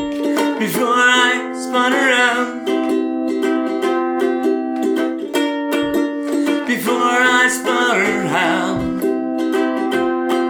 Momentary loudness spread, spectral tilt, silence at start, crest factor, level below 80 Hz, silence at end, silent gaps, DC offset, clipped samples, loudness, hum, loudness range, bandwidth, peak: 7 LU; -3.5 dB/octave; 0 s; 16 dB; -52 dBFS; 0 s; none; under 0.1%; under 0.1%; -17 LUFS; none; 3 LU; over 20 kHz; 0 dBFS